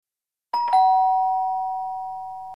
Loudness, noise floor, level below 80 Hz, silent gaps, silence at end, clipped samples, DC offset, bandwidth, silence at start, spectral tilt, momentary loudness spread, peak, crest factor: -22 LUFS; -89 dBFS; -72 dBFS; none; 0 s; under 0.1%; 0.3%; 10.5 kHz; 0.55 s; -2.5 dB/octave; 14 LU; -10 dBFS; 14 dB